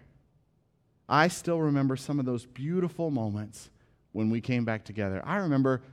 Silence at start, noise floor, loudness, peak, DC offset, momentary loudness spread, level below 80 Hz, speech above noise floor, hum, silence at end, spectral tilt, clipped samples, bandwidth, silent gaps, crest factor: 1.1 s; -69 dBFS; -29 LUFS; -8 dBFS; under 0.1%; 9 LU; -66 dBFS; 41 dB; none; 0 s; -6.5 dB/octave; under 0.1%; 15 kHz; none; 22 dB